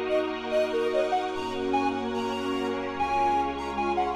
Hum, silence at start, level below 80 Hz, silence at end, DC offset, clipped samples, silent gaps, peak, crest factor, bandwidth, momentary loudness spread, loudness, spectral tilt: none; 0 s; -52 dBFS; 0 s; under 0.1%; under 0.1%; none; -14 dBFS; 14 dB; 13.5 kHz; 4 LU; -28 LUFS; -5 dB/octave